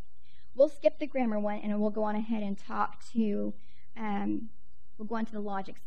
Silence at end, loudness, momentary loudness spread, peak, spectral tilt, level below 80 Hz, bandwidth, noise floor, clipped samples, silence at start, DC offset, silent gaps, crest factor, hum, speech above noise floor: 0.15 s; -32 LUFS; 11 LU; -12 dBFS; -8 dB/octave; -64 dBFS; 9 kHz; -60 dBFS; under 0.1%; 0.25 s; 2%; none; 20 dB; none; 28 dB